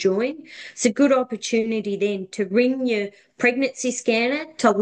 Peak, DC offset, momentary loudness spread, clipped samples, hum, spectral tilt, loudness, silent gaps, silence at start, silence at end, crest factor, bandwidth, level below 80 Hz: -4 dBFS; under 0.1%; 8 LU; under 0.1%; none; -4 dB/octave; -22 LUFS; none; 0 s; 0 s; 16 dB; 10 kHz; -70 dBFS